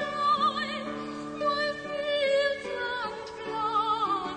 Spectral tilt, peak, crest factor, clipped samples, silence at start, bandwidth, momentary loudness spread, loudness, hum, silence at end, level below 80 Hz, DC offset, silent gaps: -3.5 dB/octave; -16 dBFS; 14 dB; under 0.1%; 0 s; 9.6 kHz; 11 LU; -29 LUFS; none; 0 s; -62 dBFS; under 0.1%; none